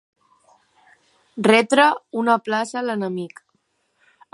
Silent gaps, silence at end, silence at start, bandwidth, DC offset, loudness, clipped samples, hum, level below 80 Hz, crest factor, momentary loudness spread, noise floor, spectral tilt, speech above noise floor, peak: none; 1.05 s; 1.35 s; 11.5 kHz; under 0.1%; -19 LUFS; under 0.1%; none; -76 dBFS; 20 dB; 15 LU; -68 dBFS; -4.5 dB/octave; 49 dB; -2 dBFS